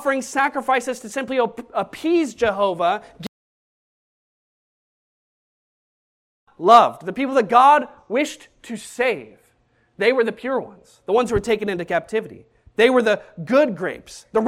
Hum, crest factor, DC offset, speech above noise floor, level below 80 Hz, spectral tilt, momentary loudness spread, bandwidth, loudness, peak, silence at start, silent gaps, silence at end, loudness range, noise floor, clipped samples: none; 22 dB; under 0.1%; 43 dB; -54 dBFS; -4.5 dB/octave; 19 LU; 15 kHz; -20 LUFS; 0 dBFS; 0 s; 3.28-6.47 s; 0 s; 7 LU; -62 dBFS; under 0.1%